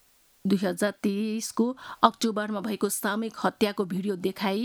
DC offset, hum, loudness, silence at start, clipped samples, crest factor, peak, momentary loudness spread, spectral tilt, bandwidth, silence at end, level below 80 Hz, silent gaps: under 0.1%; none; -28 LUFS; 0.45 s; under 0.1%; 26 dB; -2 dBFS; 6 LU; -4.5 dB/octave; 19 kHz; 0 s; -70 dBFS; none